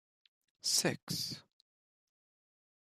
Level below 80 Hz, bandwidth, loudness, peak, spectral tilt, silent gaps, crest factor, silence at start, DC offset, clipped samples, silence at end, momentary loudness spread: -78 dBFS; 15 kHz; -34 LUFS; -16 dBFS; -2 dB/octave; 1.03-1.07 s; 26 dB; 0.65 s; under 0.1%; under 0.1%; 1.4 s; 10 LU